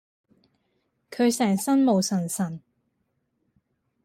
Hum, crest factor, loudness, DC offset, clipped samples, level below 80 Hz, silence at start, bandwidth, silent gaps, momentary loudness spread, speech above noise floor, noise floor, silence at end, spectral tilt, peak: none; 16 dB; -24 LUFS; under 0.1%; under 0.1%; -72 dBFS; 1.1 s; 16 kHz; none; 14 LU; 52 dB; -75 dBFS; 1.45 s; -5 dB/octave; -12 dBFS